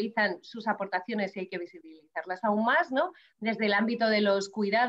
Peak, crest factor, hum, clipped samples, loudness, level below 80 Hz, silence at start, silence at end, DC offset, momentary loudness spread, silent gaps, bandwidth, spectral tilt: -14 dBFS; 16 dB; none; under 0.1%; -29 LUFS; -80 dBFS; 0 s; 0 s; under 0.1%; 12 LU; none; 8 kHz; -5 dB/octave